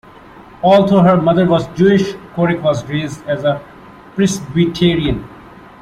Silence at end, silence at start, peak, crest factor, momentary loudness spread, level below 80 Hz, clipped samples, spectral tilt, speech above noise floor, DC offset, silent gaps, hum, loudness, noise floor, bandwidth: 0.4 s; 0.4 s; -2 dBFS; 14 dB; 11 LU; -40 dBFS; under 0.1%; -6.5 dB/octave; 25 dB; under 0.1%; none; none; -14 LUFS; -39 dBFS; 11.5 kHz